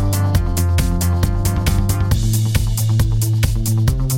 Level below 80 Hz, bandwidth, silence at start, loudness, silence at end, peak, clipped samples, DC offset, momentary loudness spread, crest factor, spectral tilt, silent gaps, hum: -22 dBFS; 17 kHz; 0 s; -18 LUFS; 0 s; -2 dBFS; under 0.1%; under 0.1%; 1 LU; 14 dB; -5.5 dB/octave; none; none